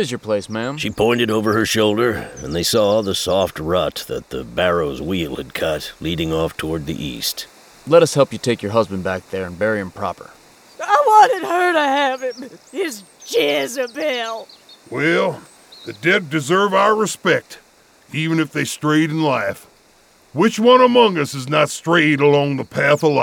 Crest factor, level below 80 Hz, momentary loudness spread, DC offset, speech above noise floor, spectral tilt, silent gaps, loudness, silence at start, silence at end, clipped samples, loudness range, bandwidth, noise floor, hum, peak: 18 dB; -48 dBFS; 14 LU; under 0.1%; 34 dB; -4.5 dB/octave; none; -18 LUFS; 0 s; 0 s; under 0.1%; 5 LU; 19.5 kHz; -52 dBFS; none; 0 dBFS